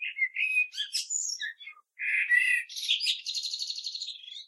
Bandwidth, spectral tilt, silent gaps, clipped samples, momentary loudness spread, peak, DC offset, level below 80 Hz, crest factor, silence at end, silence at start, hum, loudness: 14.5 kHz; 11.5 dB/octave; none; under 0.1%; 14 LU; -12 dBFS; under 0.1%; under -90 dBFS; 18 dB; 0 s; 0 s; none; -28 LUFS